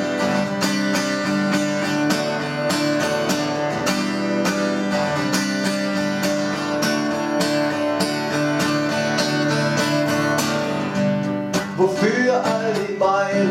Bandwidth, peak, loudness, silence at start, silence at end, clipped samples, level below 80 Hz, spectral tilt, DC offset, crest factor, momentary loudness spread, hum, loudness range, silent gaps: 16.5 kHz; -6 dBFS; -20 LUFS; 0 s; 0 s; under 0.1%; -58 dBFS; -4.5 dB/octave; under 0.1%; 16 dB; 3 LU; none; 1 LU; none